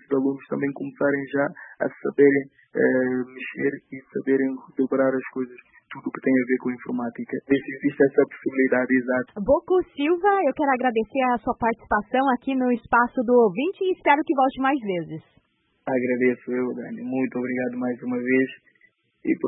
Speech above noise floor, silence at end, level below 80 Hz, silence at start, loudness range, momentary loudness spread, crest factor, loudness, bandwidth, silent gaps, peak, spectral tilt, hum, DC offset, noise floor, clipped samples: 39 dB; 0 s; -58 dBFS; 0.1 s; 4 LU; 10 LU; 18 dB; -23 LUFS; 4 kHz; none; -4 dBFS; -11 dB/octave; none; under 0.1%; -62 dBFS; under 0.1%